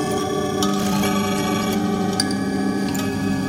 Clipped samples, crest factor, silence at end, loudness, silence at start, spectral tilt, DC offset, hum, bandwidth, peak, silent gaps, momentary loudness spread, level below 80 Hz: under 0.1%; 18 dB; 0 s; -21 LUFS; 0 s; -5 dB/octave; under 0.1%; none; 16.5 kHz; -2 dBFS; none; 3 LU; -48 dBFS